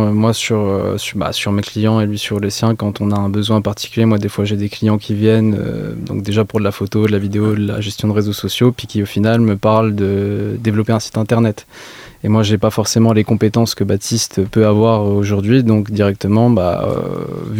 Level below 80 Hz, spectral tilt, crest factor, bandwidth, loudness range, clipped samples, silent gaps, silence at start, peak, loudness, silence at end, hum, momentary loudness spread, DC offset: -46 dBFS; -6 dB/octave; 14 dB; 16 kHz; 3 LU; under 0.1%; none; 0 s; 0 dBFS; -15 LUFS; 0 s; none; 7 LU; under 0.1%